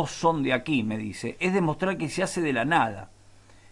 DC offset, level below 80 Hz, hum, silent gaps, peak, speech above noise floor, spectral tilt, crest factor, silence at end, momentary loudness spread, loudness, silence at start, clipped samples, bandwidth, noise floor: under 0.1%; -56 dBFS; none; none; -10 dBFS; 27 dB; -5.5 dB/octave; 18 dB; 0.65 s; 8 LU; -26 LUFS; 0 s; under 0.1%; 11.5 kHz; -53 dBFS